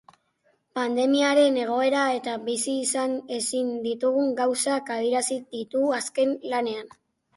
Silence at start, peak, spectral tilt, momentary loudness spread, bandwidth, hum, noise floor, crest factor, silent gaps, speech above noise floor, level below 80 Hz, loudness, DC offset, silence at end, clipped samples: 0.75 s; -8 dBFS; -2 dB/octave; 8 LU; 11.5 kHz; none; -68 dBFS; 16 dB; none; 44 dB; -74 dBFS; -25 LUFS; under 0.1%; 0.5 s; under 0.1%